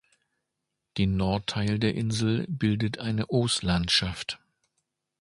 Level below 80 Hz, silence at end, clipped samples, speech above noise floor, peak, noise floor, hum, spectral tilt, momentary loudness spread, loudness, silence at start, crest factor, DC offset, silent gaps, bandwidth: -46 dBFS; 0.85 s; under 0.1%; 57 dB; -10 dBFS; -83 dBFS; none; -5 dB/octave; 9 LU; -27 LUFS; 0.95 s; 18 dB; under 0.1%; none; 11.5 kHz